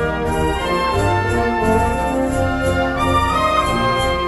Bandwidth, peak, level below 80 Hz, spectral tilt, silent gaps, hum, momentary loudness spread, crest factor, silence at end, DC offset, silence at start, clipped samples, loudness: 14 kHz; -4 dBFS; -28 dBFS; -5.5 dB/octave; none; none; 3 LU; 14 dB; 0 s; under 0.1%; 0 s; under 0.1%; -17 LUFS